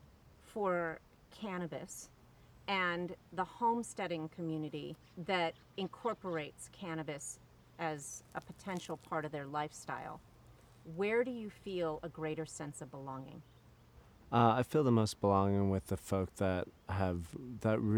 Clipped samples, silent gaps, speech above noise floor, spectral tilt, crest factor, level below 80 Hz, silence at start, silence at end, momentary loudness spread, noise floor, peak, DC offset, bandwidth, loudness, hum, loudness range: under 0.1%; none; 25 dB; -6 dB/octave; 24 dB; -64 dBFS; 0.25 s; 0 s; 16 LU; -62 dBFS; -14 dBFS; under 0.1%; 19.5 kHz; -38 LUFS; none; 9 LU